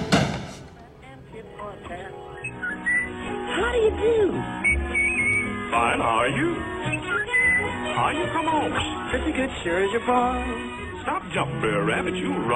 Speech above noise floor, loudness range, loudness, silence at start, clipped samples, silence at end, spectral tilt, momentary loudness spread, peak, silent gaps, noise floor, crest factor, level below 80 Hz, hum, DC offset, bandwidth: 20 dB; 5 LU; -23 LUFS; 0 s; under 0.1%; 0 s; -5 dB/octave; 15 LU; -4 dBFS; none; -44 dBFS; 20 dB; -40 dBFS; none; under 0.1%; 12.5 kHz